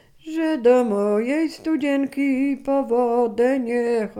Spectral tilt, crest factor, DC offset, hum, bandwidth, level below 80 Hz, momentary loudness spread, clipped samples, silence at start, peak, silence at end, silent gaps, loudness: -6 dB/octave; 14 dB; under 0.1%; none; 12.5 kHz; -60 dBFS; 6 LU; under 0.1%; 0.25 s; -6 dBFS; 0 s; none; -21 LUFS